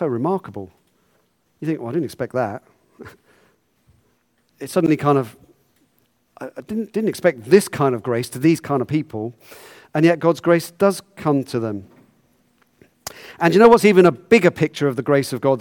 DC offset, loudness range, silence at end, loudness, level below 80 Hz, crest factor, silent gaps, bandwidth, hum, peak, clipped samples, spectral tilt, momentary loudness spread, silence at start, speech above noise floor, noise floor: under 0.1%; 12 LU; 0 s; -18 LUFS; -58 dBFS; 18 dB; none; 18 kHz; none; 0 dBFS; under 0.1%; -6.5 dB/octave; 20 LU; 0 s; 46 dB; -64 dBFS